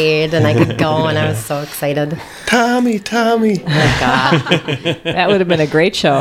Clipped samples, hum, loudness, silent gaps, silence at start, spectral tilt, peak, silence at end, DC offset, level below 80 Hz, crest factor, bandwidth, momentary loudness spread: under 0.1%; none; -14 LUFS; none; 0 s; -5.5 dB/octave; 0 dBFS; 0 s; under 0.1%; -40 dBFS; 14 dB; 16 kHz; 7 LU